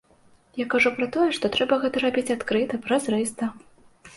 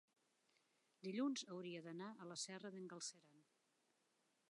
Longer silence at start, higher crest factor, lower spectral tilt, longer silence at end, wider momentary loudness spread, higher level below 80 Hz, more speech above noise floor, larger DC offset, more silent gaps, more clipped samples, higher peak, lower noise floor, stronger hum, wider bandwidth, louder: second, 0.55 s vs 1.05 s; about the same, 18 dB vs 18 dB; about the same, -3.5 dB/octave vs -3.5 dB/octave; second, 0.1 s vs 1.1 s; about the same, 10 LU vs 10 LU; first, -60 dBFS vs under -90 dBFS; about the same, 34 dB vs 34 dB; neither; neither; neither; first, -8 dBFS vs -34 dBFS; second, -58 dBFS vs -84 dBFS; neither; about the same, 11.5 kHz vs 11 kHz; first, -24 LUFS vs -50 LUFS